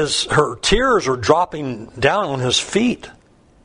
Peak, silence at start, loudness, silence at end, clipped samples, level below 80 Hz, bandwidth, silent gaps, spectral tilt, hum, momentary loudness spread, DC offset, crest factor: 0 dBFS; 0 s; -17 LUFS; 0.55 s; under 0.1%; -36 dBFS; 11 kHz; none; -3.5 dB/octave; none; 8 LU; under 0.1%; 18 dB